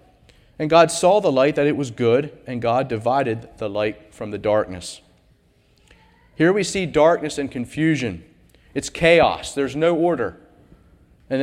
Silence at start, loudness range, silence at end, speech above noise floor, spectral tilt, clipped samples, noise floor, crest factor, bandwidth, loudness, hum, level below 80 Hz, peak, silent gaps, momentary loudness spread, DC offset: 0.6 s; 6 LU; 0 s; 39 dB; -5 dB/octave; under 0.1%; -58 dBFS; 20 dB; 14.5 kHz; -20 LUFS; none; -50 dBFS; -2 dBFS; none; 14 LU; under 0.1%